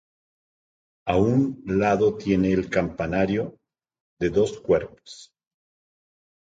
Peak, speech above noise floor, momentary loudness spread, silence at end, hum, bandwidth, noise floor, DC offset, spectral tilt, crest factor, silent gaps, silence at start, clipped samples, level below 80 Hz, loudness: -8 dBFS; over 67 dB; 14 LU; 1.25 s; none; 9 kHz; under -90 dBFS; under 0.1%; -7.5 dB/octave; 18 dB; 4.01-4.17 s; 1.05 s; under 0.1%; -48 dBFS; -23 LUFS